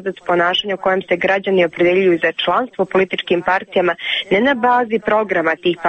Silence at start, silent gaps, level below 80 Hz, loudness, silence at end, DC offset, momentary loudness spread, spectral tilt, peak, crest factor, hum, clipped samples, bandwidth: 0 s; none; -56 dBFS; -16 LUFS; 0 s; under 0.1%; 4 LU; -6 dB/octave; -4 dBFS; 12 dB; none; under 0.1%; 8.4 kHz